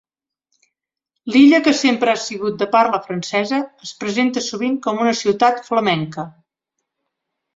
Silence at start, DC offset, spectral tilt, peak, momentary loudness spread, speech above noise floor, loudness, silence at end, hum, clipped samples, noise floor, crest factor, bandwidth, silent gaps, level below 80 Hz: 1.25 s; under 0.1%; -4.5 dB/octave; -2 dBFS; 14 LU; 63 dB; -17 LUFS; 1.25 s; none; under 0.1%; -80 dBFS; 16 dB; 7.8 kHz; none; -64 dBFS